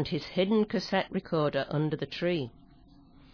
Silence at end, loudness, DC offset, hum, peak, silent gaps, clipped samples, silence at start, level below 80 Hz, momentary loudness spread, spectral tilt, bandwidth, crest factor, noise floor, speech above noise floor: 0.85 s; -30 LUFS; under 0.1%; none; -14 dBFS; none; under 0.1%; 0 s; -58 dBFS; 5 LU; -7 dB/octave; 5.4 kHz; 16 dB; -56 dBFS; 27 dB